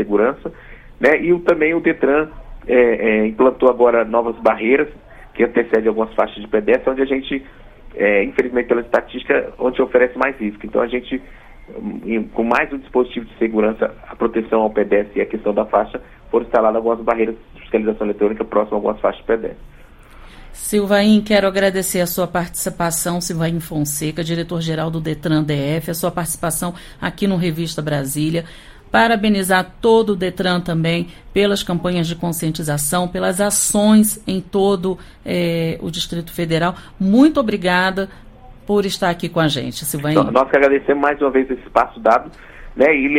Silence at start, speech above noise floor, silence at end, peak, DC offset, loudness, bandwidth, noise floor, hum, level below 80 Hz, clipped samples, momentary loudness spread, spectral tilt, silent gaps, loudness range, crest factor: 0 s; 24 dB; 0 s; 0 dBFS; under 0.1%; -18 LUFS; 16.5 kHz; -41 dBFS; none; -42 dBFS; under 0.1%; 9 LU; -5 dB/octave; none; 5 LU; 16 dB